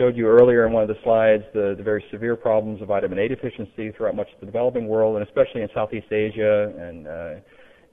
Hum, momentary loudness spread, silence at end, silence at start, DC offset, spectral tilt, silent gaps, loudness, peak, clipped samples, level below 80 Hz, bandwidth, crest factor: none; 16 LU; 0.5 s; 0 s; under 0.1%; -9.5 dB/octave; none; -21 LUFS; -4 dBFS; under 0.1%; -52 dBFS; 3.8 kHz; 18 dB